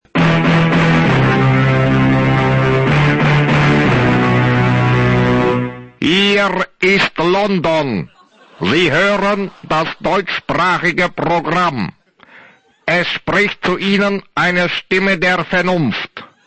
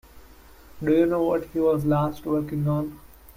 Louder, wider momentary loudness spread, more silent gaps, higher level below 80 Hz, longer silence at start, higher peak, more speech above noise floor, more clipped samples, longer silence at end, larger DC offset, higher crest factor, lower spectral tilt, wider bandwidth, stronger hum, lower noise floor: first, -14 LUFS vs -24 LUFS; about the same, 6 LU vs 7 LU; neither; first, -38 dBFS vs -50 dBFS; about the same, 0.15 s vs 0.15 s; first, 0 dBFS vs -10 dBFS; first, 31 dB vs 26 dB; neither; first, 0.2 s vs 0.05 s; neither; about the same, 14 dB vs 16 dB; second, -6.5 dB/octave vs -9 dB/octave; second, 8.6 kHz vs 16 kHz; neither; about the same, -46 dBFS vs -49 dBFS